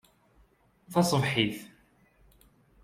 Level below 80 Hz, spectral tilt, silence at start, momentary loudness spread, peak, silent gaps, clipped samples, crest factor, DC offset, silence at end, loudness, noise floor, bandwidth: -62 dBFS; -5 dB/octave; 0.9 s; 7 LU; -10 dBFS; none; under 0.1%; 22 dB; under 0.1%; 1.15 s; -27 LUFS; -64 dBFS; 16 kHz